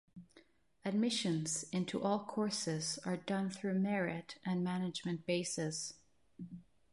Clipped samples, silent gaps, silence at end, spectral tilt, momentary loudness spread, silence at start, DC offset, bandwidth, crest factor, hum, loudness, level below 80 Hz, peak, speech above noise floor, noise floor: under 0.1%; none; 0.3 s; -4.5 dB/octave; 10 LU; 0.15 s; under 0.1%; 11.5 kHz; 16 dB; none; -38 LUFS; -78 dBFS; -22 dBFS; 30 dB; -68 dBFS